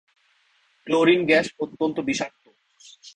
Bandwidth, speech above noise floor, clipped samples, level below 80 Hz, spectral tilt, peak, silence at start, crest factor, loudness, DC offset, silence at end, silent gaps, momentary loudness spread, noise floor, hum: 10 kHz; 42 dB; under 0.1%; -64 dBFS; -4.5 dB/octave; -4 dBFS; 0.85 s; 20 dB; -22 LUFS; under 0.1%; 0.05 s; none; 11 LU; -64 dBFS; none